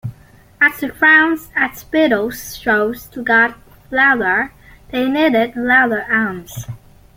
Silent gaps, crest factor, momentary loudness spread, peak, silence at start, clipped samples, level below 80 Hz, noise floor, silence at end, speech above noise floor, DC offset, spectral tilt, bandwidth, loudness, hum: none; 16 dB; 14 LU; 0 dBFS; 0.05 s; under 0.1%; -48 dBFS; -45 dBFS; 0.4 s; 30 dB; under 0.1%; -4.5 dB/octave; 17 kHz; -15 LUFS; none